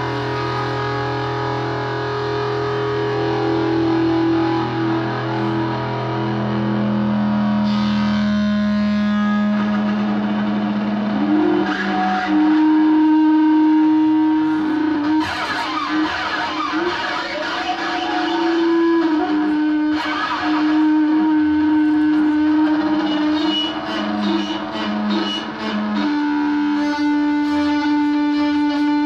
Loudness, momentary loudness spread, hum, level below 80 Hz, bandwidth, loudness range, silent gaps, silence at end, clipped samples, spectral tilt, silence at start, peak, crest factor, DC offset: -18 LUFS; 7 LU; none; -50 dBFS; 7.4 kHz; 5 LU; none; 0 s; under 0.1%; -6.5 dB/octave; 0 s; -6 dBFS; 12 dB; under 0.1%